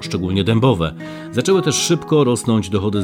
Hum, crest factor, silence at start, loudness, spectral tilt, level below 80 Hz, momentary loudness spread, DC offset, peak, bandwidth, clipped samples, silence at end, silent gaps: none; 16 dB; 0 s; -17 LUFS; -5 dB/octave; -48 dBFS; 7 LU; under 0.1%; -2 dBFS; 17.5 kHz; under 0.1%; 0 s; none